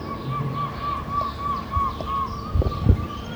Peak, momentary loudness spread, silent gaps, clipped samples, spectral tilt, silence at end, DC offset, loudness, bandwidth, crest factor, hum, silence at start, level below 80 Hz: -4 dBFS; 6 LU; none; under 0.1%; -7.5 dB/octave; 0 s; under 0.1%; -25 LUFS; over 20 kHz; 22 dB; none; 0 s; -32 dBFS